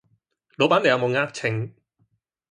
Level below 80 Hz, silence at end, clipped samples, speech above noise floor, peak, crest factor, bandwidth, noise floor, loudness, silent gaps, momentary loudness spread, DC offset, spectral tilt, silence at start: -66 dBFS; 0.8 s; under 0.1%; 47 dB; -4 dBFS; 20 dB; 11 kHz; -69 dBFS; -22 LUFS; none; 11 LU; under 0.1%; -5.5 dB/octave; 0.6 s